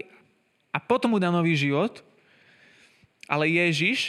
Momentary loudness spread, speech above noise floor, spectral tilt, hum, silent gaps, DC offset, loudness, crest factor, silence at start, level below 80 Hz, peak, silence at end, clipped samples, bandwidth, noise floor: 11 LU; 43 dB; -5.5 dB/octave; none; none; under 0.1%; -24 LUFS; 20 dB; 0.75 s; -74 dBFS; -6 dBFS; 0 s; under 0.1%; 12 kHz; -66 dBFS